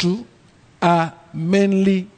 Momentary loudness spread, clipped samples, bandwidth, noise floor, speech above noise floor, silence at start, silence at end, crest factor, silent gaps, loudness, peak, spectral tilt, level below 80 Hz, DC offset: 11 LU; under 0.1%; 9.2 kHz; -51 dBFS; 33 dB; 0 s; 0.1 s; 14 dB; none; -19 LUFS; -4 dBFS; -7 dB/octave; -58 dBFS; under 0.1%